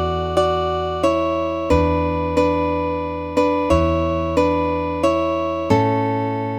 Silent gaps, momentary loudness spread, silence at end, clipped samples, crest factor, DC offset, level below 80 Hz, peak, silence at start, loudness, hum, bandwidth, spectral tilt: none; 5 LU; 0 s; under 0.1%; 16 dB; under 0.1%; -34 dBFS; -2 dBFS; 0 s; -19 LUFS; none; 11.5 kHz; -7 dB/octave